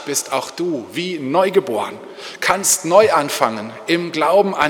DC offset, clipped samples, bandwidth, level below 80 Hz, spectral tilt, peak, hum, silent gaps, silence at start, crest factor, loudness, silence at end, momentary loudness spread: under 0.1%; under 0.1%; 19 kHz; -60 dBFS; -3 dB/octave; 0 dBFS; none; none; 0 s; 18 dB; -17 LUFS; 0 s; 11 LU